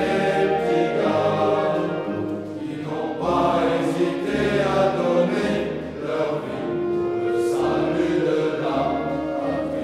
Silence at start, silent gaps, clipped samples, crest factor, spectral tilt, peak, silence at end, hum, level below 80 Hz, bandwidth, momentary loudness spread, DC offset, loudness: 0 s; none; under 0.1%; 14 dB; -6.5 dB/octave; -8 dBFS; 0 s; none; -50 dBFS; 12.5 kHz; 7 LU; under 0.1%; -22 LUFS